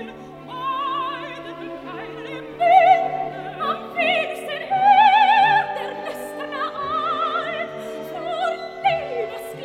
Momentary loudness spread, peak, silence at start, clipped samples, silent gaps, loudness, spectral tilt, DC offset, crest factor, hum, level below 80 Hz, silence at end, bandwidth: 19 LU; -2 dBFS; 0 s; under 0.1%; none; -20 LUFS; -4 dB/octave; under 0.1%; 18 dB; none; -60 dBFS; 0 s; 15 kHz